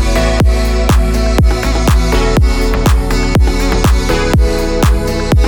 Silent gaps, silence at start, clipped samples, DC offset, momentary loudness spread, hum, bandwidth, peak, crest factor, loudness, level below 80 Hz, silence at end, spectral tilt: none; 0 s; under 0.1%; under 0.1%; 2 LU; none; 19 kHz; 0 dBFS; 10 dB; -12 LUFS; -12 dBFS; 0 s; -5.5 dB/octave